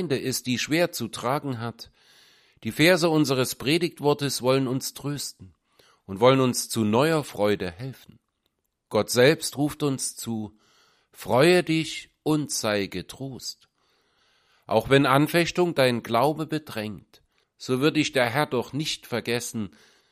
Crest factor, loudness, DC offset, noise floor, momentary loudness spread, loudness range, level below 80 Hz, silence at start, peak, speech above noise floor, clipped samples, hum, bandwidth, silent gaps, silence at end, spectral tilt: 22 dB; -24 LUFS; under 0.1%; -76 dBFS; 15 LU; 3 LU; -60 dBFS; 0 s; -4 dBFS; 52 dB; under 0.1%; none; 15.5 kHz; none; 0.45 s; -4.5 dB/octave